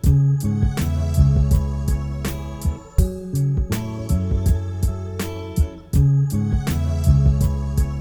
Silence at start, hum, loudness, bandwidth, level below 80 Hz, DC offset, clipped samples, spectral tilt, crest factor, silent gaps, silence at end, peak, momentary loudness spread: 0.05 s; none; -21 LUFS; over 20 kHz; -24 dBFS; under 0.1%; under 0.1%; -7.5 dB/octave; 16 dB; none; 0 s; -2 dBFS; 9 LU